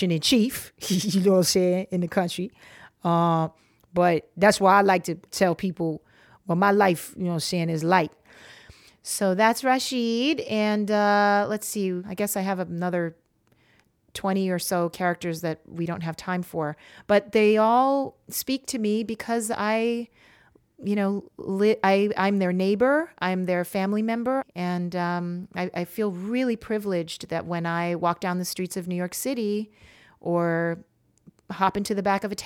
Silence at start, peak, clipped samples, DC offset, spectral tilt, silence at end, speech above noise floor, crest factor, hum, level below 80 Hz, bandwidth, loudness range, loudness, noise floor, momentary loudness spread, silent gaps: 0 s; -6 dBFS; under 0.1%; under 0.1%; -5 dB/octave; 0 s; 40 dB; 20 dB; none; -62 dBFS; 17.5 kHz; 6 LU; -24 LUFS; -64 dBFS; 11 LU; none